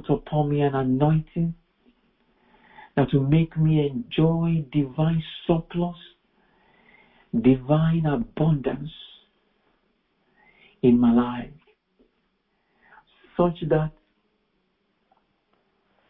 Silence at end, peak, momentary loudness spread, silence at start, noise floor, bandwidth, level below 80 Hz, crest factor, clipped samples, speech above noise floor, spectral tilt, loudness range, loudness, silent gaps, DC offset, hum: 2.2 s; -4 dBFS; 11 LU; 0.05 s; -71 dBFS; 4 kHz; -48 dBFS; 20 dB; under 0.1%; 49 dB; -12.5 dB/octave; 7 LU; -23 LUFS; none; under 0.1%; none